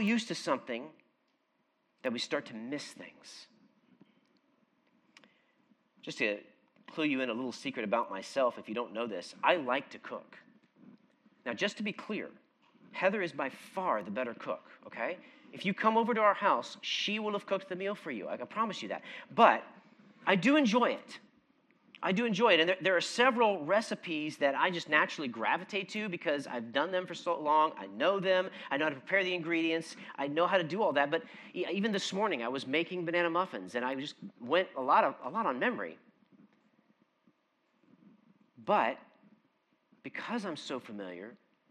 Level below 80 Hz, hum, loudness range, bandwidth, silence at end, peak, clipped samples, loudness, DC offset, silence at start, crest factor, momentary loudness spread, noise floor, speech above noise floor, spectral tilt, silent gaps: under -90 dBFS; none; 10 LU; 12 kHz; 0.35 s; -8 dBFS; under 0.1%; -32 LUFS; under 0.1%; 0 s; 24 dB; 17 LU; -77 dBFS; 44 dB; -4.5 dB/octave; none